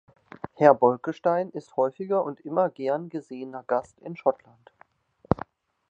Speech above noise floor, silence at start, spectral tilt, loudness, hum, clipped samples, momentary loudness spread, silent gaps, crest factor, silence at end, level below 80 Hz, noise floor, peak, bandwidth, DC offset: 35 dB; 0.45 s; -8.5 dB/octave; -26 LUFS; none; under 0.1%; 18 LU; none; 24 dB; 0.55 s; -56 dBFS; -60 dBFS; -2 dBFS; 8 kHz; under 0.1%